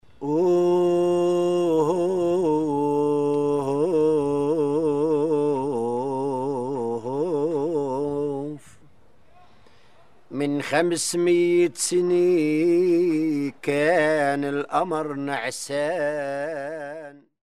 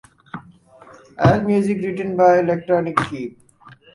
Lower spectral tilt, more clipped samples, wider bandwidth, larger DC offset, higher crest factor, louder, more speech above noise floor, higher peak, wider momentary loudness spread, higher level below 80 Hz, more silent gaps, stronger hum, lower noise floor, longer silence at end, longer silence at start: second, -5.5 dB/octave vs -8 dB/octave; neither; first, 13 kHz vs 11.5 kHz; first, 0.3% vs under 0.1%; about the same, 18 dB vs 20 dB; second, -23 LUFS vs -18 LUFS; first, 36 dB vs 30 dB; second, -6 dBFS vs 0 dBFS; second, 8 LU vs 23 LU; second, -64 dBFS vs -48 dBFS; neither; neither; first, -58 dBFS vs -47 dBFS; second, 0.3 s vs 0.65 s; second, 0.2 s vs 0.35 s